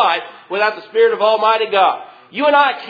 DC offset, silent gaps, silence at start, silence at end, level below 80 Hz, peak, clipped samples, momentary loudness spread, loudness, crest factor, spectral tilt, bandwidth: under 0.1%; none; 0 s; 0 s; -70 dBFS; 0 dBFS; under 0.1%; 11 LU; -15 LUFS; 16 dB; -4.5 dB/octave; 5 kHz